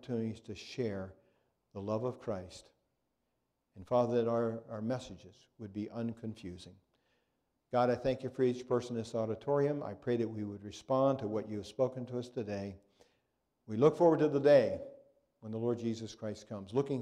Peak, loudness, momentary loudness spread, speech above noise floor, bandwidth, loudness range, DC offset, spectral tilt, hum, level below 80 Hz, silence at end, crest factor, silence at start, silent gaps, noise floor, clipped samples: -14 dBFS; -34 LUFS; 18 LU; 49 dB; 10.5 kHz; 10 LU; under 0.1%; -7.5 dB/octave; none; -70 dBFS; 0 s; 22 dB; 0.05 s; none; -83 dBFS; under 0.1%